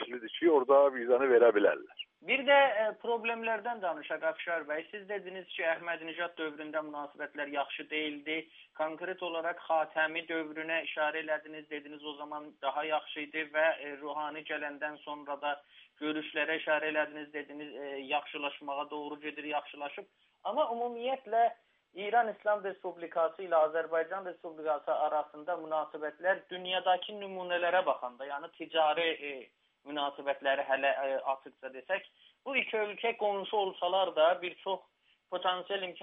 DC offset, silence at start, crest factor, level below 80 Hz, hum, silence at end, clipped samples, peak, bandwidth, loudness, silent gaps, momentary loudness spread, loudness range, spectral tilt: under 0.1%; 0 s; 22 dB; under -90 dBFS; none; 0 s; under 0.1%; -12 dBFS; 3.9 kHz; -33 LUFS; none; 14 LU; 6 LU; 0 dB/octave